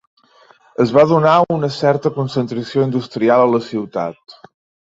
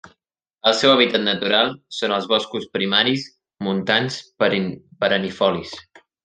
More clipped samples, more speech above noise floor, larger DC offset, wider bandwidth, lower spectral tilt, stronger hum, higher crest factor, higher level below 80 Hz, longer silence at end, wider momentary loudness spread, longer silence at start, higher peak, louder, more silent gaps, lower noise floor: neither; second, 35 dB vs 56 dB; neither; second, 7.8 kHz vs 9.6 kHz; first, -7.5 dB/octave vs -4.5 dB/octave; neither; about the same, 16 dB vs 20 dB; first, -58 dBFS vs -66 dBFS; first, 0.65 s vs 0.45 s; about the same, 12 LU vs 13 LU; first, 0.8 s vs 0.05 s; about the same, -2 dBFS vs -2 dBFS; first, -16 LUFS vs -19 LUFS; neither; second, -50 dBFS vs -76 dBFS